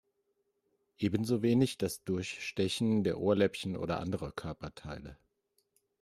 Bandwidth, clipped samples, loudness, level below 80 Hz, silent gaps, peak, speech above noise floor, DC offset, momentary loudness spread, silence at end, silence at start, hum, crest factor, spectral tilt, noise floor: 14 kHz; under 0.1%; -33 LUFS; -62 dBFS; none; -16 dBFS; 47 dB; under 0.1%; 15 LU; 0.85 s; 1 s; none; 18 dB; -6 dB/octave; -79 dBFS